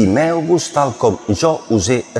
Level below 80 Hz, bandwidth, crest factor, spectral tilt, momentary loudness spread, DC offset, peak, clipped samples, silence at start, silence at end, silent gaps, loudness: -44 dBFS; 12 kHz; 14 dB; -5.5 dB/octave; 2 LU; under 0.1%; -2 dBFS; under 0.1%; 0 s; 0 s; none; -16 LUFS